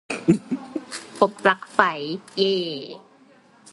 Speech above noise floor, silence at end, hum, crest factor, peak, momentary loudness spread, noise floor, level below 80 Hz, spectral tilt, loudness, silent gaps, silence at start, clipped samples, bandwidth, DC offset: 32 dB; 0.75 s; none; 24 dB; 0 dBFS; 14 LU; -54 dBFS; -62 dBFS; -5 dB/octave; -23 LUFS; none; 0.1 s; under 0.1%; 11.5 kHz; under 0.1%